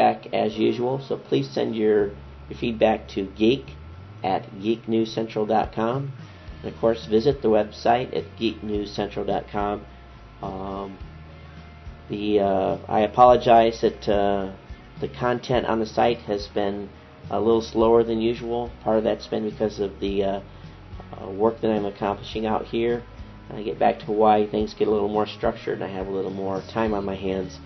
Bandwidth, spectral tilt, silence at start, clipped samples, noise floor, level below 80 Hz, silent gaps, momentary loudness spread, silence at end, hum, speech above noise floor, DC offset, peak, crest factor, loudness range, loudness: 6.2 kHz; -7 dB/octave; 0 s; under 0.1%; -44 dBFS; -46 dBFS; none; 18 LU; 0 s; none; 21 dB; under 0.1%; -2 dBFS; 22 dB; 7 LU; -24 LUFS